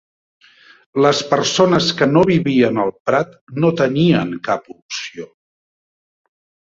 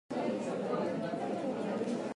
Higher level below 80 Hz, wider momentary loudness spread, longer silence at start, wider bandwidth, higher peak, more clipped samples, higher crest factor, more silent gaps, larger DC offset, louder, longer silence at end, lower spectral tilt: first, -54 dBFS vs -78 dBFS; first, 13 LU vs 2 LU; first, 0.95 s vs 0.1 s; second, 7.8 kHz vs 11.5 kHz; first, -2 dBFS vs -22 dBFS; neither; about the same, 16 dB vs 14 dB; first, 3.00-3.06 s, 3.41-3.47 s, 4.82-4.89 s vs none; neither; first, -16 LUFS vs -36 LUFS; first, 1.4 s vs 0 s; about the same, -5.5 dB/octave vs -6.5 dB/octave